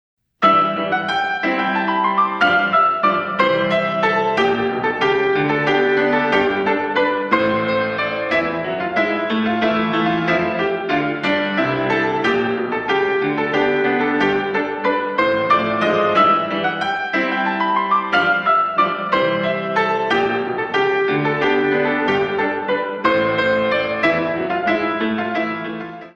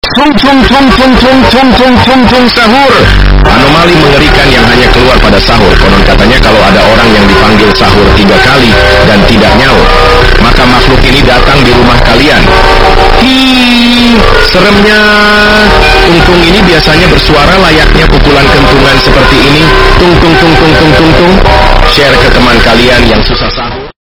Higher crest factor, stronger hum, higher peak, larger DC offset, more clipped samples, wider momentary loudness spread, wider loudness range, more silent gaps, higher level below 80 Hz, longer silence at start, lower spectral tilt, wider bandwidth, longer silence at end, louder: first, 18 dB vs 2 dB; neither; about the same, 0 dBFS vs 0 dBFS; neither; second, under 0.1% vs 20%; first, 5 LU vs 1 LU; about the same, 2 LU vs 1 LU; neither; second, -54 dBFS vs -10 dBFS; first, 0.4 s vs 0.05 s; about the same, -6 dB/octave vs -5 dB/octave; second, 8 kHz vs 18 kHz; about the same, 0.05 s vs 0.1 s; second, -18 LUFS vs -3 LUFS